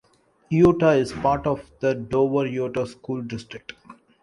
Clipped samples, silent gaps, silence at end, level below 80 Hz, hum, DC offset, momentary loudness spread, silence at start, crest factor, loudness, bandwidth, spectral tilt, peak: under 0.1%; none; 0.3 s; -50 dBFS; none; under 0.1%; 16 LU; 0.5 s; 18 dB; -22 LUFS; 11.5 kHz; -7.5 dB/octave; -6 dBFS